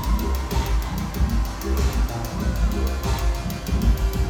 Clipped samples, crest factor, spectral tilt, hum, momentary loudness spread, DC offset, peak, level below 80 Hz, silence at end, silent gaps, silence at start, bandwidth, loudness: under 0.1%; 14 dB; -6 dB/octave; none; 4 LU; under 0.1%; -8 dBFS; -24 dBFS; 0 s; none; 0 s; 17.5 kHz; -25 LUFS